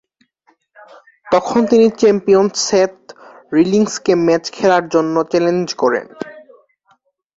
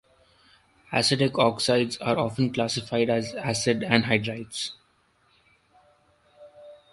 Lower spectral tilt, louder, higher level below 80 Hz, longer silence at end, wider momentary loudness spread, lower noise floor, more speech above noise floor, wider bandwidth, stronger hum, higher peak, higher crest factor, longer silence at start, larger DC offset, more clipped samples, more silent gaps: about the same, -5 dB/octave vs -4.5 dB/octave; first, -15 LUFS vs -25 LUFS; about the same, -58 dBFS vs -60 dBFS; first, 0.95 s vs 0.15 s; second, 7 LU vs 10 LU; second, -59 dBFS vs -65 dBFS; first, 45 dB vs 41 dB; second, 7.8 kHz vs 11.5 kHz; neither; first, 0 dBFS vs -4 dBFS; second, 16 dB vs 24 dB; first, 1.25 s vs 0.9 s; neither; neither; neither